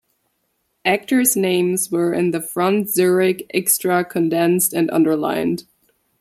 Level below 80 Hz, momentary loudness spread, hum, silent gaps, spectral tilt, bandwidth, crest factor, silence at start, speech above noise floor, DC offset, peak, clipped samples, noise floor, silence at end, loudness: -64 dBFS; 5 LU; none; none; -4 dB/octave; 16 kHz; 18 dB; 0.85 s; 52 dB; under 0.1%; -2 dBFS; under 0.1%; -69 dBFS; 0.6 s; -18 LUFS